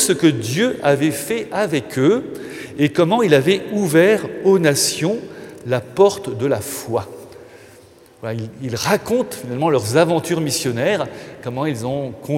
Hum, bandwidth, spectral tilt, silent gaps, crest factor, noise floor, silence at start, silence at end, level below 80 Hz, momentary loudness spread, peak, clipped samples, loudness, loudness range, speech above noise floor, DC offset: none; 16.5 kHz; -4.5 dB/octave; none; 18 dB; -46 dBFS; 0 s; 0 s; -58 dBFS; 14 LU; 0 dBFS; under 0.1%; -18 LUFS; 6 LU; 28 dB; under 0.1%